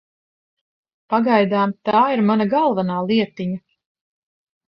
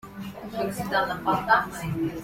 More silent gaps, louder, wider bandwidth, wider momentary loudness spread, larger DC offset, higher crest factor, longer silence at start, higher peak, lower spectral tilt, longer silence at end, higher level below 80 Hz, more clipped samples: neither; first, -19 LUFS vs -26 LUFS; second, 5.8 kHz vs 16.5 kHz; second, 9 LU vs 14 LU; neither; about the same, 16 dB vs 20 dB; first, 1.1 s vs 0.05 s; about the same, -4 dBFS vs -6 dBFS; first, -9 dB/octave vs -5 dB/octave; first, 1.1 s vs 0 s; second, -64 dBFS vs -52 dBFS; neither